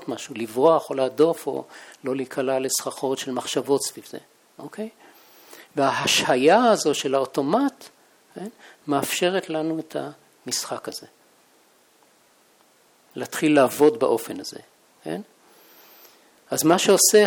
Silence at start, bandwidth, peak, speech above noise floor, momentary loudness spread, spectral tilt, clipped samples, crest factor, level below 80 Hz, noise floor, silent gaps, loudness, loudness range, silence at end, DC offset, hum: 0 s; over 20 kHz; -4 dBFS; 37 dB; 21 LU; -3 dB/octave; under 0.1%; 20 dB; -72 dBFS; -59 dBFS; none; -22 LUFS; 8 LU; 0 s; under 0.1%; none